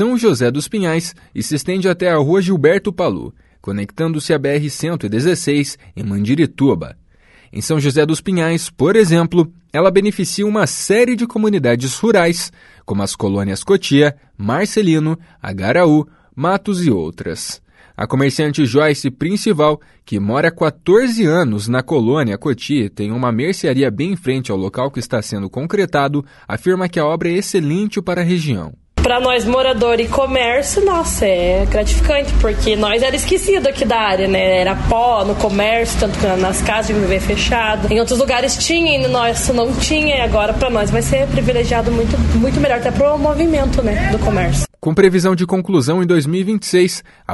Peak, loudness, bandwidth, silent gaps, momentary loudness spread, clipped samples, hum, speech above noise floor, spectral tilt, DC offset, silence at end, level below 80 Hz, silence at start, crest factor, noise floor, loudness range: 0 dBFS; -15 LUFS; 12 kHz; none; 8 LU; under 0.1%; none; 34 dB; -5 dB/octave; under 0.1%; 0 s; -28 dBFS; 0 s; 16 dB; -49 dBFS; 3 LU